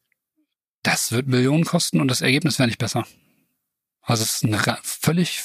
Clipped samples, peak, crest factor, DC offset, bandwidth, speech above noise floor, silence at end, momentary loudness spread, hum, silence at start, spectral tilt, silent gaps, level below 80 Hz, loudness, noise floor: under 0.1%; -2 dBFS; 20 dB; under 0.1%; 15.5 kHz; 59 dB; 0 s; 7 LU; none; 0.85 s; -4 dB/octave; none; -60 dBFS; -21 LUFS; -79 dBFS